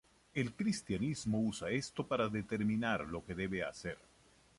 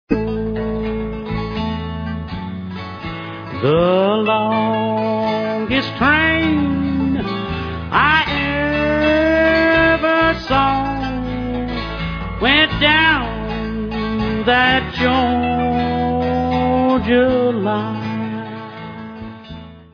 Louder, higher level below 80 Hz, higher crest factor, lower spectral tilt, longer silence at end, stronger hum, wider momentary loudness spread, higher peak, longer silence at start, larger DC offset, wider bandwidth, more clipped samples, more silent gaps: second, -38 LUFS vs -17 LUFS; second, -62 dBFS vs -34 dBFS; about the same, 18 dB vs 18 dB; second, -5.5 dB/octave vs -7 dB/octave; first, 0.65 s vs 0.1 s; neither; second, 7 LU vs 15 LU; second, -20 dBFS vs 0 dBFS; first, 0.35 s vs 0.1 s; neither; first, 11.5 kHz vs 5.4 kHz; neither; neither